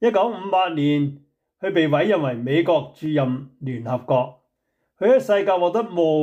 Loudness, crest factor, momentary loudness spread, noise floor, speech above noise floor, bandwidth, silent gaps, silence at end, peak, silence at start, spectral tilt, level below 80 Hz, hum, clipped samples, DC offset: -21 LUFS; 14 dB; 9 LU; -74 dBFS; 54 dB; 14.5 kHz; none; 0 s; -8 dBFS; 0 s; -7.5 dB/octave; -70 dBFS; none; under 0.1%; under 0.1%